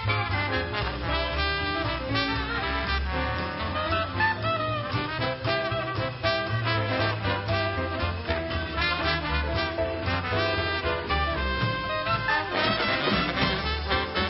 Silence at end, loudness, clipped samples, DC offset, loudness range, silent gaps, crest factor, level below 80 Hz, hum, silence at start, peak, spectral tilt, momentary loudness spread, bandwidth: 0 s; -27 LUFS; under 0.1%; under 0.1%; 2 LU; none; 16 dB; -38 dBFS; none; 0 s; -10 dBFS; -9 dB/octave; 4 LU; 5.8 kHz